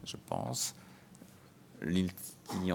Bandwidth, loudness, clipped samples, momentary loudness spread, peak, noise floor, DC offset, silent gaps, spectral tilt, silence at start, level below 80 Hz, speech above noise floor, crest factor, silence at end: 19 kHz; -37 LUFS; under 0.1%; 23 LU; -18 dBFS; -58 dBFS; under 0.1%; none; -4.5 dB/octave; 0 s; -66 dBFS; 22 dB; 20 dB; 0 s